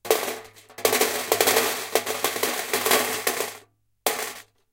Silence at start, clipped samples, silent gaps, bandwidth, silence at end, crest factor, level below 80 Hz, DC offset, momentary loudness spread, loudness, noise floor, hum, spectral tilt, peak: 0.05 s; under 0.1%; none; 17 kHz; 0.3 s; 24 dB; -64 dBFS; under 0.1%; 12 LU; -23 LUFS; -54 dBFS; none; -0.5 dB/octave; 0 dBFS